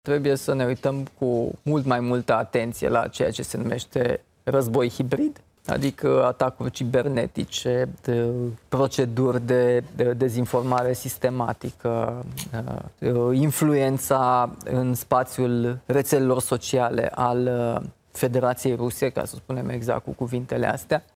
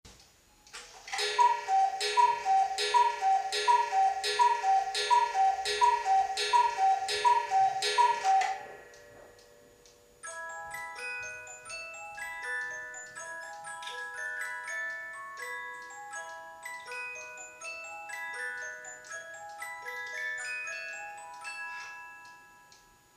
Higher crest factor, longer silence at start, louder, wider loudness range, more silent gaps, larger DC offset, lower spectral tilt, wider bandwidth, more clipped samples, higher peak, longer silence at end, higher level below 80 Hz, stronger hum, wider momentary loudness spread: about the same, 18 dB vs 18 dB; about the same, 0.05 s vs 0.05 s; first, -24 LUFS vs -30 LUFS; second, 3 LU vs 13 LU; neither; neither; first, -6 dB/octave vs 1 dB/octave; about the same, 16.5 kHz vs 15 kHz; neither; first, -6 dBFS vs -14 dBFS; second, 0.15 s vs 0.7 s; first, -54 dBFS vs -72 dBFS; neither; second, 8 LU vs 16 LU